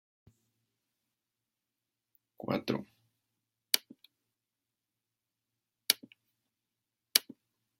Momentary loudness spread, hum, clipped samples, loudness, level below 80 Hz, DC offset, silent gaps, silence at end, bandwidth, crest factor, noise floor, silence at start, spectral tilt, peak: 10 LU; none; under 0.1%; -32 LUFS; -80 dBFS; under 0.1%; none; 0.6 s; 16 kHz; 38 dB; -89 dBFS; 2.45 s; -2 dB/octave; -2 dBFS